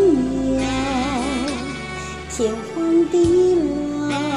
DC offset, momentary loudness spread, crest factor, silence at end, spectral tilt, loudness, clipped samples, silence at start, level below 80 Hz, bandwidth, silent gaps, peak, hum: 0.2%; 12 LU; 14 dB; 0 s; -5.5 dB/octave; -20 LUFS; under 0.1%; 0 s; -38 dBFS; 11.5 kHz; none; -6 dBFS; none